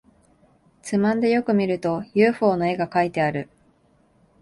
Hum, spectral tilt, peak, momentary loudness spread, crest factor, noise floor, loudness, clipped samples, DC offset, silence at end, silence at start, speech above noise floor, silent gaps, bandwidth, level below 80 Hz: none; -7 dB/octave; -6 dBFS; 8 LU; 18 dB; -60 dBFS; -22 LUFS; under 0.1%; under 0.1%; 1 s; 0.85 s; 40 dB; none; 11.5 kHz; -60 dBFS